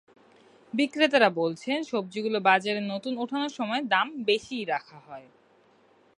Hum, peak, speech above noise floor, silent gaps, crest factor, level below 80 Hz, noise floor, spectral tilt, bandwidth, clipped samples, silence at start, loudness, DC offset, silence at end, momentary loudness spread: none; -6 dBFS; 34 dB; none; 22 dB; -76 dBFS; -61 dBFS; -4.5 dB/octave; 11 kHz; under 0.1%; 0.75 s; -26 LUFS; under 0.1%; 0.95 s; 11 LU